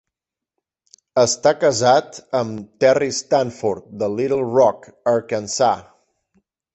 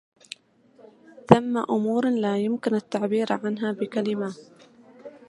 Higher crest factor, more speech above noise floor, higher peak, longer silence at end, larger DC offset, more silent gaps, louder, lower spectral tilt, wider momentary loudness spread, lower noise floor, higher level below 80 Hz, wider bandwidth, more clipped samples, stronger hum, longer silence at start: second, 18 dB vs 26 dB; first, 67 dB vs 34 dB; about the same, -2 dBFS vs 0 dBFS; first, 0.95 s vs 0.1 s; neither; neither; first, -19 LUFS vs -24 LUFS; second, -4 dB/octave vs -7 dB/octave; second, 9 LU vs 23 LU; first, -85 dBFS vs -57 dBFS; about the same, -58 dBFS vs -62 dBFS; second, 8.4 kHz vs 11.5 kHz; neither; neither; about the same, 1.15 s vs 1.15 s